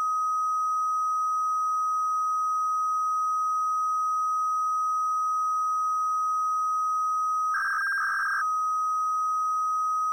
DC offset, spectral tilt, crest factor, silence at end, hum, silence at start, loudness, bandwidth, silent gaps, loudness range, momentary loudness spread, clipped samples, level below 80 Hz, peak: under 0.1%; 3.5 dB/octave; 6 dB; 0 s; none; 0 s; -26 LUFS; 16 kHz; none; 0 LU; 0 LU; under 0.1%; -84 dBFS; -20 dBFS